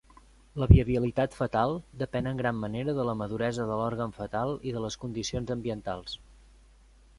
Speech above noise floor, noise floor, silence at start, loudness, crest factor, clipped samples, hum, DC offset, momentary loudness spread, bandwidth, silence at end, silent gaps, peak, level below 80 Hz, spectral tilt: 29 dB; -57 dBFS; 0.55 s; -29 LUFS; 26 dB; under 0.1%; none; under 0.1%; 13 LU; 11.5 kHz; 1 s; none; -2 dBFS; -38 dBFS; -7 dB/octave